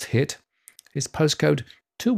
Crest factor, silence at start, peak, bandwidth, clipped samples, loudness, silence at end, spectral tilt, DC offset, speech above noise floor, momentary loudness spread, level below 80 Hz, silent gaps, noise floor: 16 dB; 0 s; -8 dBFS; 16 kHz; under 0.1%; -24 LUFS; 0 s; -5 dB/octave; under 0.1%; 31 dB; 16 LU; -58 dBFS; none; -54 dBFS